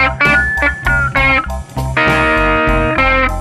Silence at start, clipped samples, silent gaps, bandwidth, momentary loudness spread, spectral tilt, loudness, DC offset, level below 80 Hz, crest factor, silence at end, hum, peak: 0 s; under 0.1%; none; 14 kHz; 4 LU; -5.5 dB/octave; -12 LUFS; under 0.1%; -22 dBFS; 12 dB; 0 s; none; -2 dBFS